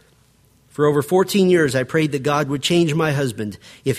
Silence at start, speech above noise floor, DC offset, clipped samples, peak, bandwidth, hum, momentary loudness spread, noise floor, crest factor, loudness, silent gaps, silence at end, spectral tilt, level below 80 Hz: 0.8 s; 37 dB; under 0.1%; under 0.1%; -4 dBFS; 15.5 kHz; none; 11 LU; -56 dBFS; 16 dB; -18 LUFS; none; 0 s; -5.5 dB/octave; -56 dBFS